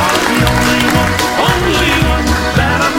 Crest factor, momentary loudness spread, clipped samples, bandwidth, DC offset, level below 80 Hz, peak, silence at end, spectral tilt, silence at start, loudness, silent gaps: 12 dB; 2 LU; under 0.1%; 17 kHz; under 0.1%; -22 dBFS; 0 dBFS; 0 s; -4 dB/octave; 0 s; -11 LUFS; none